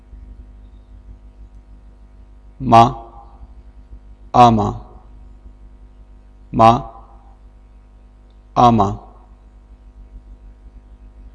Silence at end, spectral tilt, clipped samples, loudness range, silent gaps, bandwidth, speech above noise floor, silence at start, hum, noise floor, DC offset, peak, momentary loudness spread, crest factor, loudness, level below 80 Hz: 1.15 s; -7 dB/octave; under 0.1%; 4 LU; none; 11 kHz; 33 dB; 2.6 s; 50 Hz at -40 dBFS; -44 dBFS; under 0.1%; 0 dBFS; 22 LU; 20 dB; -14 LUFS; -38 dBFS